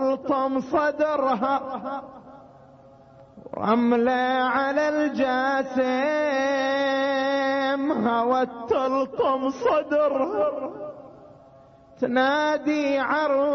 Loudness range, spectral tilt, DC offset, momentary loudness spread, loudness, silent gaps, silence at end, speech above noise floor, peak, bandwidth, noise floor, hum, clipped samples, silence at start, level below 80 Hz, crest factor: 3 LU; -5 dB/octave; under 0.1%; 9 LU; -23 LUFS; none; 0 s; 28 dB; -8 dBFS; 6.6 kHz; -51 dBFS; none; under 0.1%; 0 s; -62 dBFS; 14 dB